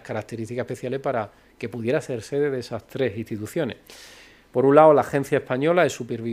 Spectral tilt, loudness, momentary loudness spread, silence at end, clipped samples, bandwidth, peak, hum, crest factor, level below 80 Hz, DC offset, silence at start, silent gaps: -6.5 dB/octave; -23 LUFS; 18 LU; 0 s; under 0.1%; 15.5 kHz; 0 dBFS; none; 22 dB; -62 dBFS; under 0.1%; 0.05 s; none